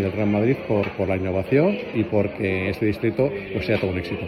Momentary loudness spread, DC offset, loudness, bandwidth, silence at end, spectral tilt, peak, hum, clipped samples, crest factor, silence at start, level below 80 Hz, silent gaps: 4 LU; under 0.1%; -23 LUFS; 14 kHz; 0 s; -8.5 dB/octave; -6 dBFS; none; under 0.1%; 16 dB; 0 s; -50 dBFS; none